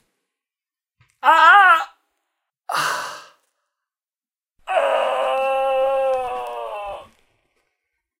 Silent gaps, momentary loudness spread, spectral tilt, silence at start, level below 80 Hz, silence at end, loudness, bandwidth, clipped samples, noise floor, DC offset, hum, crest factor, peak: none; 21 LU; -1 dB/octave; 1.25 s; -60 dBFS; 1.15 s; -17 LUFS; 16 kHz; under 0.1%; under -90 dBFS; under 0.1%; none; 20 dB; 0 dBFS